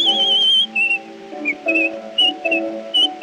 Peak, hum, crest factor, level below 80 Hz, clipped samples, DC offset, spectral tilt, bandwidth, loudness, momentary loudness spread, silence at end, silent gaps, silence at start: -6 dBFS; none; 12 dB; -72 dBFS; under 0.1%; under 0.1%; -1 dB/octave; 10.5 kHz; -16 LUFS; 10 LU; 0 s; none; 0 s